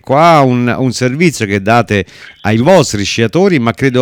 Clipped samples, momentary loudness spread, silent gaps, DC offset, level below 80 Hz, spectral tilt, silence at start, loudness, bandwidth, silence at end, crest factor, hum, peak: 0.6%; 8 LU; none; under 0.1%; -44 dBFS; -5.5 dB/octave; 0.1 s; -11 LUFS; 17.5 kHz; 0 s; 10 dB; none; 0 dBFS